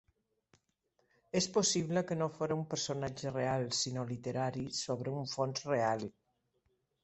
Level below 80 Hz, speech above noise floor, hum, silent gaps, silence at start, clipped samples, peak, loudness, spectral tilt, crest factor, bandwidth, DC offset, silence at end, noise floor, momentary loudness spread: -68 dBFS; 43 dB; none; none; 1.35 s; under 0.1%; -18 dBFS; -35 LUFS; -4 dB/octave; 18 dB; 8.4 kHz; under 0.1%; 0.95 s; -79 dBFS; 8 LU